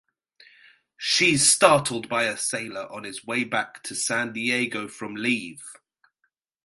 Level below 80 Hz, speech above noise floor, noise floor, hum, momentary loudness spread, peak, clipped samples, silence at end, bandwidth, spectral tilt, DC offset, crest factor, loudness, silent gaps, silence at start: -64 dBFS; 51 dB; -75 dBFS; none; 18 LU; -2 dBFS; under 0.1%; 0.9 s; 12 kHz; -2 dB/octave; under 0.1%; 24 dB; -23 LUFS; none; 1 s